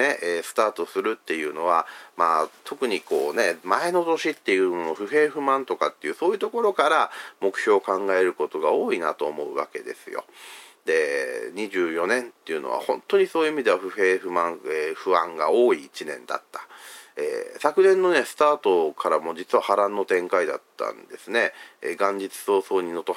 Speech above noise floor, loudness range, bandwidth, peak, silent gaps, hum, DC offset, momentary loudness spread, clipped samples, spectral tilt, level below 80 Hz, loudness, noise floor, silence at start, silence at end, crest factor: 20 dB; 4 LU; 16 kHz; -4 dBFS; none; none; under 0.1%; 12 LU; under 0.1%; -3.5 dB/octave; -84 dBFS; -24 LUFS; -44 dBFS; 0 s; 0 s; 20 dB